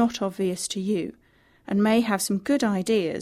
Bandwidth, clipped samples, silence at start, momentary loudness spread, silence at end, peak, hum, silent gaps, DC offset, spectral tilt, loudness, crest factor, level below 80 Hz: 15 kHz; under 0.1%; 0 s; 7 LU; 0 s; -10 dBFS; none; none; under 0.1%; -5 dB/octave; -24 LUFS; 14 dB; -62 dBFS